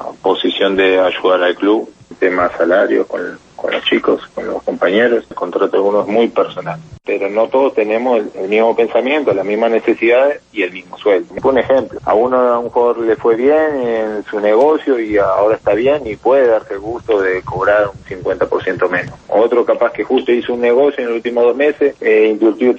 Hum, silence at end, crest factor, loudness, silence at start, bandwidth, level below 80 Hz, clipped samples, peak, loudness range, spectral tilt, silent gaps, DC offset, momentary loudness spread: none; 0 s; 12 dB; -14 LUFS; 0 s; 7.6 kHz; -50 dBFS; under 0.1%; -2 dBFS; 2 LU; -6 dB/octave; none; under 0.1%; 8 LU